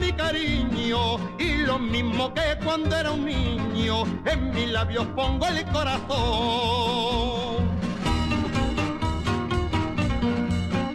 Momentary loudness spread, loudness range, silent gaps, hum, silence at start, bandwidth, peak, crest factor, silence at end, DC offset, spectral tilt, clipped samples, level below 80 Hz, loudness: 3 LU; 1 LU; none; none; 0 s; 12.5 kHz; -12 dBFS; 12 dB; 0 s; under 0.1%; -5.5 dB/octave; under 0.1%; -34 dBFS; -25 LUFS